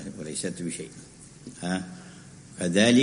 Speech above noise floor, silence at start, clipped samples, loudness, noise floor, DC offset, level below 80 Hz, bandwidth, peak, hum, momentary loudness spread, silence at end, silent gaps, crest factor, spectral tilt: 22 dB; 0 s; under 0.1%; -28 LUFS; -47 dBFS; under 0.1%; -62 dBFS; 10.5 kHz; -6 dBFS; none; 22 LU; 0 s; none; 22 dB; -4.5 dB/octave